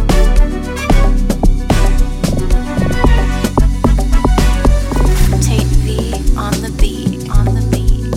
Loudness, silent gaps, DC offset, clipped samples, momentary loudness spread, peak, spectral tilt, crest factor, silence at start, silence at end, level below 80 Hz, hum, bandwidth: -15 LUFS; none; under 0.1%; under 0.1%; 4 LU; 0 dBFS; -6 dB/octave; 10 dB; 0 s; 0 s; -12 dBFS; none; 15 kHz